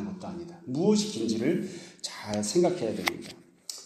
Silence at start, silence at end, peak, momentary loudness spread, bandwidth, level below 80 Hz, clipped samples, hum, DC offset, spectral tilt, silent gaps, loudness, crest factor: 0 s; 0 s; -6 dBFS; 16 LU; 15.5 kHz; -66 dBFS; under 0.1%; none; under 0.1%; -4.5 dB/octave; none; -29 LUFS; 22 dB